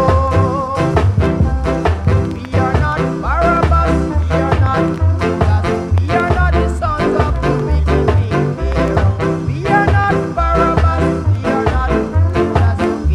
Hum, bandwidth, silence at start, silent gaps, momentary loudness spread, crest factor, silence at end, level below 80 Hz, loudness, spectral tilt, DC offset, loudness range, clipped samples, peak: none; 10.5 kHz; 0 s; none; 4 LU; 14 dB; 0 s; -20 dBFS; -15 LUFS; -8 dB/octave; under 0.1%; 1 LU; under 0.1%; 0 dBFS